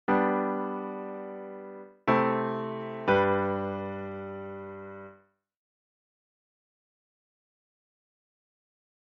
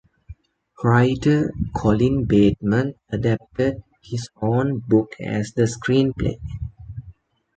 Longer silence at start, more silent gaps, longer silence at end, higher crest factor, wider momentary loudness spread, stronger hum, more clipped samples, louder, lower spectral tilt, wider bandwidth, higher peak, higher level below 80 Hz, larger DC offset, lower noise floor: second, 0.1 s vs 0.3 s; neither; first, 3.85 s vs 0.45 s; about the same, 22 dB vs 18 dB; first, 18 LU vs 15 LU; neither; neither; second, -29 LUFS vs -21 LUFS; second, -5 dB/octave vs -7.5 dB/octave; second, 6.2 kHz vs 9 kHz; second, -12 dBFS vs -4 dBFS; second, -68 dBFS vs -40 dBFS; neither; first, -60 dBFS vs -48 dBFS